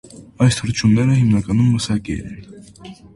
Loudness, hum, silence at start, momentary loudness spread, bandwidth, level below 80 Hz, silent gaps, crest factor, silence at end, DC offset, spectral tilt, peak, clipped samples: -17 LUFS; none; 0.15 s; 13 LU; 11.5 kHz; -40 dBFS; none; 16 dB; 0.2 s; under 0.1%; -6 dB/octave; -2 dBFS; under 0.1%